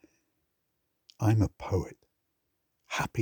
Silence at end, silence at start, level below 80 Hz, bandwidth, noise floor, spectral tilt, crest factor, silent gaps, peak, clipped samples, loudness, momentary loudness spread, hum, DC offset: 0 s; 1.2 s; -54 dBFS; over 20 kHz; -79 dBFS; -6.5 dB/octave; 20 dB; none; -12 dBFS; under 0.1%; -30 LUFS; 9 LU; none; under 0.1%